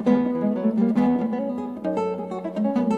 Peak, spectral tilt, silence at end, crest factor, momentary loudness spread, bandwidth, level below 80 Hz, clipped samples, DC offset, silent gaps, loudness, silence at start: -8 dBFS; -9 dB/octave; 0 s; 16 dB; 8 LU; 8 kHz; -64 dBFS; under 0.1%; under 0.1%; none; -24 LUFS; 0 s